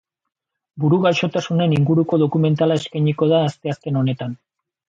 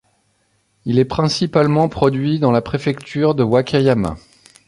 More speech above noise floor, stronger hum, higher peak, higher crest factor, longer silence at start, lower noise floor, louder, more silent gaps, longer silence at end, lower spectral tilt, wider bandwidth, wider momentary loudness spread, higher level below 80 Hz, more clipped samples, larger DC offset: first, 64 dB vs 47 dB; neither; second, -4 dBFS vs 0 dBFS; about the same, 14 dB vs 16 dB; about the same, 0.75 s vs 0.85 s; first, -82 dBFS vs -63 dBFS; about the same, -19 LUFS vs -17 LUFS; neither; about the same, 0.55 s vs 0.5 s; about the same, -7.5 dB/octave vs -7 dB/octave; second, 7.6 kHz vs 11.5 kHz; about the same, 7 LU vs 7 LU; second, -60 dBFS vs -44 dBFS; neither; neither